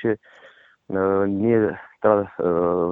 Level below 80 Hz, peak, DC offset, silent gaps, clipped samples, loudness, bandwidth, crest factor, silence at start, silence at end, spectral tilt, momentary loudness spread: -58 dBFS; -4 dBFS; under 0.1%; none; under 0.1%; -22 LUFS; 3.9 kHz; 18 dB; 0 s; 0 s; -11 dB/octave; 6 LU